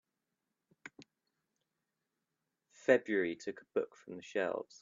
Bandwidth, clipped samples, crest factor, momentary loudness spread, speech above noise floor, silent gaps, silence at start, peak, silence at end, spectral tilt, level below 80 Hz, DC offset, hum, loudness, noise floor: 7.6 kHz; under 0.1%; 26 dB; 24 LU; 53 dB; none; 0.85 s; -14 dBFS; 0.2 s; -5 dB/octave; -84 dBFS; under 0.1%; none; -35 LUFS; -88 dBFS